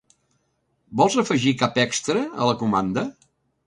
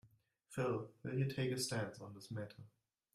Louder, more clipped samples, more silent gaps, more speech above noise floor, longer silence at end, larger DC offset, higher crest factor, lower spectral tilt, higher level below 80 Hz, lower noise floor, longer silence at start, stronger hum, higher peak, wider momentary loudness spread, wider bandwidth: first, -22 LUFS vs -42 LUFS; neither; neither; first, 49 dB vs 28 dB; about the same, 0.55 s vs 0.45 s; neither; about the same, 20 dB vs 16 dB; about the same, -4.5 dB/octave vs -5 dB/octave; first, -58 dBFS vs -76 dBFS; about the same, -70 dBFS vs -70 dBFS; first, 0.9 s vs 0.05 s; neither; first, -4 dBFS vs -26 dBFS; second, 8 LU vs 13 LU; second, 11.5 kHz vs 15 kHz